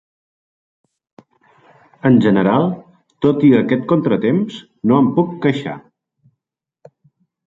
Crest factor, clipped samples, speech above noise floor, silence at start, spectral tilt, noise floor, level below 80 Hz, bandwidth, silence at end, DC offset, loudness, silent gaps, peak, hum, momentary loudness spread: 16 dB; under 0.1%; 67 dB; 2.05 s; -9 dB/octave; -82 dBFS; -58 dBFS; 7.6 kHz; 1.65 s; under 0.1%; -16 LUFS; none; -2 dBFS; none; 12 LU